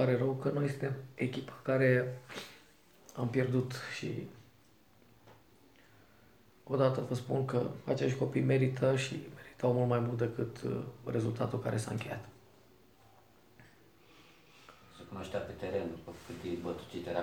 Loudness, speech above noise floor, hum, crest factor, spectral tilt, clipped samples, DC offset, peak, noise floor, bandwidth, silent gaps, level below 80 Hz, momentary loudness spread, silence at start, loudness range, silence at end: -35 LUFS; 31 dB; none; 20 dB; -7 dB/octave; under 0.1%; under 0.1%; -14 dBFS; -65 dBFS; 15.5 kHz; none; -68 dBFS; 16 LU; 0 s; 12 LU; 0 s